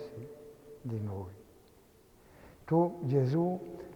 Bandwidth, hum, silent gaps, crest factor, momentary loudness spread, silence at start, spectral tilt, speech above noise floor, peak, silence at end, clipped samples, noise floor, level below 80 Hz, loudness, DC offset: 19 kHz; none; none; 20 dB; 21 LU; 0 s; -9.5 dB/octave; 30 dB; -16 dBFS; 0 s; under 0.1%; -61 dBFS; -66 dBFS; -32 LUFS; under 0.1%